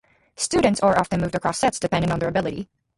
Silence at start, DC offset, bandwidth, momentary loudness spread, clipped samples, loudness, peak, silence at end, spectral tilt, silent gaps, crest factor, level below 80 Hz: 0.4 s; under 0.1%; 11.5 kHz; 8 LU; under 0.1%; -22 LUFS; -4 dBFS; 0.35 s; -5 dB/octave; none; 18 dB; -46 dBFS